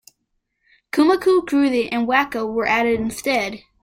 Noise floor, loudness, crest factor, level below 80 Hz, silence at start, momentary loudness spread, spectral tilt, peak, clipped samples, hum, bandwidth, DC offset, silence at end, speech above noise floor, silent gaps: -73 dBFS; -19 LUFS; 18 dB; -52 dBFS; 0.95 s; 6 LU; -4.5 dB/octave; -2 dBFS; under 0.1%; none; 16.5 kHz; under 0.1%; 0.25 s; 54 dB; none